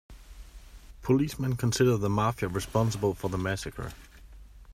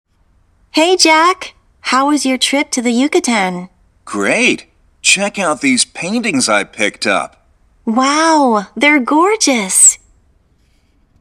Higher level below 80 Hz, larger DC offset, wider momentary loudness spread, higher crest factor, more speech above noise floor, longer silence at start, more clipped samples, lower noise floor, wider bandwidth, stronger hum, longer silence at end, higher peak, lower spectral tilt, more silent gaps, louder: first, -48 dBFS vs -54 dBFS; neither; about the same, 13 LU vs 11 LU; about the same, 18 dB vs 14 dB; second, 22 dB vs 42 dB; second, 0.1 s vs 0.75 s; neither; second, -49 dBFS vs -54 dBFS; about the same, 15.5 kHz vs 17 kHz; neither; second, 0 s vs 1.25 s; second, -12 dBFS vs 0 dBFS; first, -6 dB/octave vs -1.5 dB/octave; neither; second, -28 LUFS vs -12 LUFS